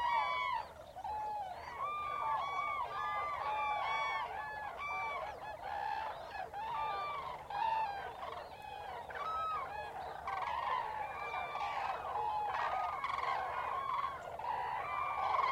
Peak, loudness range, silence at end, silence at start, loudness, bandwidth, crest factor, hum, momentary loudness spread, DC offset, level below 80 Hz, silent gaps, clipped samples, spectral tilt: -22 dBFS; 3 LU; 0 s; 0 s; -39 LUFS; 16.5 kHz; 16 dB; none; 9 LU; under 0.1%; -66 dBFS; none; under 0.1%; -3.5 dB/octave